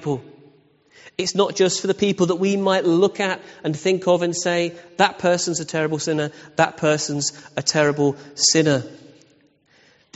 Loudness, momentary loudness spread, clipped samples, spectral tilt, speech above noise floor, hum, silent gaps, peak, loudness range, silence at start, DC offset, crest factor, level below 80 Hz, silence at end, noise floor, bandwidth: -20 LUFS; 8 LU; under 0.1%; -4 dB/octave; 38 dB; none; none; -2 dBFS; 1 LU; 0 s; under 0.1%; 20 dB; -64 dBFS; 1.2 s; -58 dBFS; 8.2 kHz